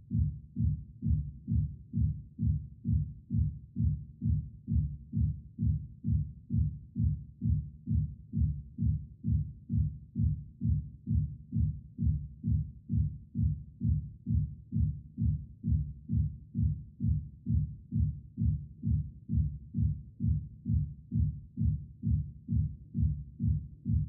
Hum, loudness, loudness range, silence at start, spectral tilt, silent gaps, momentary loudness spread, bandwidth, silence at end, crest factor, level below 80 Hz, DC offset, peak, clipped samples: none; -34 LUFS; 1 LU; 0 s; -18.5 dB/octave; none; 2 LU; 0.5 kHz; 0 s; 14 dB; -38 dBFS; under 0.1%; -18 dBFS; under 0.1%